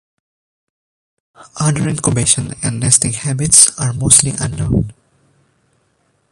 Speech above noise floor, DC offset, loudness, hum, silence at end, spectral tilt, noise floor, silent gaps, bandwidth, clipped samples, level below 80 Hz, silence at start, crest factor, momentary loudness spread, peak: 47 dB; under 0.1%; -12 LUFS; none; 1.4 s; -3.5 dB/octave; -61 dBFS; none; 16 kHz; 0.2%; -36 dBFS; 1.4 s; 16 dB; 11 LU; 0 dBFS